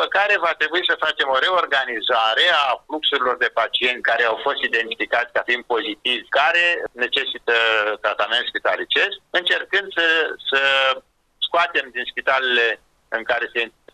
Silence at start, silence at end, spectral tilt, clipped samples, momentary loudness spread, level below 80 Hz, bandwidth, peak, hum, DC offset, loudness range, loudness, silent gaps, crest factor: 0 s; 0.25 s; -1.5 dB/octave; under 0.1%; 6 LU; -64 dBFS; 12.5 kHz; -6 dBFS; none; under 0.1%; 2 LU; -19 LUFS; none; 16 dB